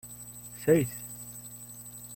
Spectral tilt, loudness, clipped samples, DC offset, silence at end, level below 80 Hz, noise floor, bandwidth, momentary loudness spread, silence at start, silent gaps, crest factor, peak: -6 dB/octave; -30 LUFS; under 0.1%; under 0.1%; 0 s; -60 dBFS; -46 dBFS; 16.5 kHz; 17 LU; 0.05 s; none; 22 dB; -12 dBFS